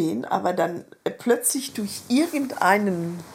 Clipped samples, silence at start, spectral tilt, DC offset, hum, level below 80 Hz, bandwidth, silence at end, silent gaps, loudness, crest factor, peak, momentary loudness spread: under 0.1%; 0 s; -4 dB/octave; under 0.1%; none; -70 dBFS; 16.5 kHz; 0 s; none; -24 LUFS; 20 dB; -4 dBFS; 10 LU